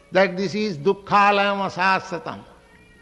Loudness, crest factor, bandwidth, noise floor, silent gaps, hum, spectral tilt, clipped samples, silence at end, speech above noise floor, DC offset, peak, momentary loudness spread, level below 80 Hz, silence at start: -20 LUFS; 18 dB; 10.5 kHz; -50 dBFS; none; none; -5 dB/octave; under 0.1%; 0.6 s; 30 dB; under 0.1%; -4 dBFS; 15 LU; -58 dBFS; 0.1 s